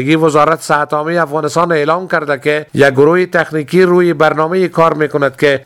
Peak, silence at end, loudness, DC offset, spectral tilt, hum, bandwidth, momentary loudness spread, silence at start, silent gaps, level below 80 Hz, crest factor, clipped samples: 0 dBFS; 0.05 s; -12 LUFS; under 0.1%; -6 dB/octave; none; 14 kHz; 5 LU; 0 s; none; -52 dBFS; 12 dB; 0.2%